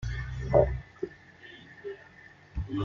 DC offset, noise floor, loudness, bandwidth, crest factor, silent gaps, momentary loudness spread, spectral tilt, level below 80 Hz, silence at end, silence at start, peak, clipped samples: under 0.1%; -54 dBFS; -30 LUFS; 7.4 kHz; 24 dB; none; 25 LU; -8 dB/octave; -40 dBFS; 0 s; 0 s; -8 dBFS; under 0.1%